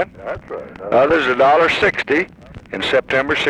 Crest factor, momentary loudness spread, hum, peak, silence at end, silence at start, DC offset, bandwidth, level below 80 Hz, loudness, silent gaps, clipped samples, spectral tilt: 14 dB; 17 LU; none; -4 dBFS; 0 s; 0 s; under 0.1%; 11 kHz; -46 dBFS; -15 LUFS; none; under 0.1%; -4.5 dB/octave